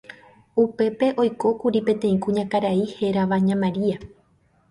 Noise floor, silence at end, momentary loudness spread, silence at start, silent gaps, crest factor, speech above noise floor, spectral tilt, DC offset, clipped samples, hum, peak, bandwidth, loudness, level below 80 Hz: -61 dBFS; 0.65 s; 4 LU; 0.1 s; none; 14 dB; 40 dB; -8 dB/octave; under 0.1%; under 0.1%; none; -8 dBFS; 11.5 kHz; -22 LUFS; -58 dBFS